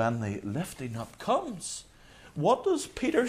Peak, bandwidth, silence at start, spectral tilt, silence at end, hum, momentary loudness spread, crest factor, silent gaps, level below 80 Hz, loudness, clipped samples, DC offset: -12 dBFS; 15.5 kHz; 0 s; -5.5 dB/octave; 0 s; none; 11 LU; 18 dB; none; -58 dBFS; -31 LUFS; under 0.1%; under 0.1%